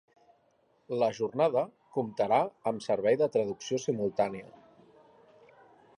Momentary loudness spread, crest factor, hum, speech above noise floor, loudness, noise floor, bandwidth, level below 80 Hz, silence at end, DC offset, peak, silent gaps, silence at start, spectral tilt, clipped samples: 8 LU; 18 dB; none; 40 dB; -30 LUFS; -69 dBFS; 11 kHz; -74 dBFS; 1.5 s; under 0.1%; -12 dBFS; none; 0.9 s; -5.5 dB/octave; under 0.1%